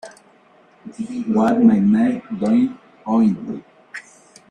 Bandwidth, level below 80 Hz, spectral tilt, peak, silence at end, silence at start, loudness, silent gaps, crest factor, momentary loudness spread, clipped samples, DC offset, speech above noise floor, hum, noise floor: 9.6 kHz; -60 dBFS; -8 dB/octave; -2 dBFS; 0.5 s; 0.05 s; -18 LUFS; none; 16 dB; 22 LU; under 0.1%; under 0.1%; 35 dB; none; -52 dBFS